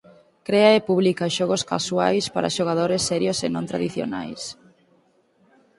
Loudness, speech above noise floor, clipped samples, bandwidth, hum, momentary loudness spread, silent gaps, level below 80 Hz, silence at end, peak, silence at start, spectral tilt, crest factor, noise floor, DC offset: -22 LUFS; 40 dB; under 0.1%; 11.5 kHz; none; 13 LU; none; -60 dBFS; 1.25 s; -2 dBFS; 0.5 s; -4.5 dB/octave; 20 dB; -61 dBFS; under 0.1%